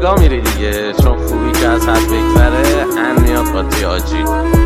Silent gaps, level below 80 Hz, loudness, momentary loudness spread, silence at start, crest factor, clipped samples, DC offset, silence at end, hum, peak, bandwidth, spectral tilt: none; -16 dBFS; -13 LUFS; 5 LU; 0 s; 12 dB; under 0.1%; under 0.1%; 0 s; none; 0 dBFS; 16 kHz; -5.5 dB/octave